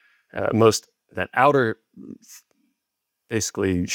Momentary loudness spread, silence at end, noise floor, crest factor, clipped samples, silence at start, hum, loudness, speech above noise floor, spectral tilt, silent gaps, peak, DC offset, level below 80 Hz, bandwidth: 24 LU; 0 s; -81 dBFS; 20 dB; under 0.1%; 0.35 s; none; -21 LUFS; 59 dB; -4.5 dB/octave; none; -4 dBFS; under 0.1%; -62 dBFS; 17 kHz